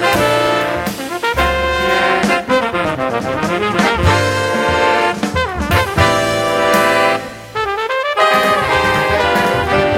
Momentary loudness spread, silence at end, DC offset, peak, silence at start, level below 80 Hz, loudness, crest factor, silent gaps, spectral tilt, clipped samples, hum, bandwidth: 6 LU; 0 s; under 0.1%; 0 dBFS; 0 s; -34 dBFS; -14 LUFS; 14 dB; none; -4.5 dB/octave; under 0.1%; none; 16.5 kHz